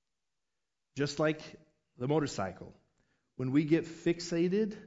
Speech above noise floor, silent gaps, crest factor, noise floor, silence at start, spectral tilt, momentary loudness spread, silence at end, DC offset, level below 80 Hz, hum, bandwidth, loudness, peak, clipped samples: 57 dB; none; 18 dB; -89 dBFS; 0.95 s; -6 dB/octave; 20 LU; 0 s; under 0.1%; -66 dBFS; none; 8 kHz; -33 LUFS; -16 dBFS; under 0.1%